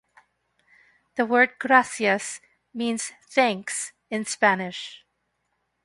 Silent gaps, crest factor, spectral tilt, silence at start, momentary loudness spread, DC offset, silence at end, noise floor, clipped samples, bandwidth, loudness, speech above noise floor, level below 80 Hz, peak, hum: none; 24 dB; -3 dB/octave; 1.15 s; 15 LU; under 0.1%; 0.9 s; -75 dBFS; under 0.1%; 11.5 kHz; -23 LUFS; 52 dB; -74 dBFS; -2 dBFS; 60 Hz at -70 dBFS